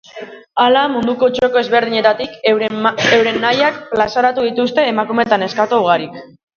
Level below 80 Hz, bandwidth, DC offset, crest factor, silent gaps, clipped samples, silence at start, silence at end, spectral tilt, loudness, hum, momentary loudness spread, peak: -56 dBFS; 7 kHz; under 0.1%; 14 dB; none; under 0.1%; 0.15 s; 0.3 s; -4.5 dB/octave; -14 LUFS; none; 5 LU; 0 dBFS